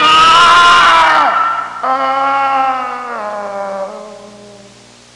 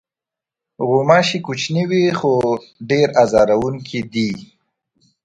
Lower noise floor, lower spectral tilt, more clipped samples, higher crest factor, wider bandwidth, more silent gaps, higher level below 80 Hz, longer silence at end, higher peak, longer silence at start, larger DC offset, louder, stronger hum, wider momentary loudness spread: second, -40 dBFS vs -87 dBFS; second, -1.5 dB/octave vs -5.5 dB/octave; neither; second, 10 dB vs 18 dB; about the same, 11.5 kHz vs 10.5 kHz; neither; about the same, -48 dBFS vs -52 dBFS; second, 0.65 s vs 0.8 s; about the same, 0 dBFS vs 0 dBFS; second, 0 s vs 0.8 s; neither; first, -9 LUFS vs -17 LUFS; first, 60 Hz at -50 dBFS vs none; first, 16 LU vs 10 LU